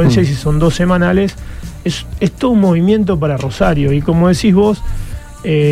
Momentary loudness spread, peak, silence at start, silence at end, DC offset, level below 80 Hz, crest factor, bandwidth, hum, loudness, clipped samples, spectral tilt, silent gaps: 13 LU; 0 dBFS; 0 s; 0 s; under 0.1%; -26 dBFS; 12 dB; 13.5 kHz; none; -13 LUFS; under 0.1%; -7 dB/octave; none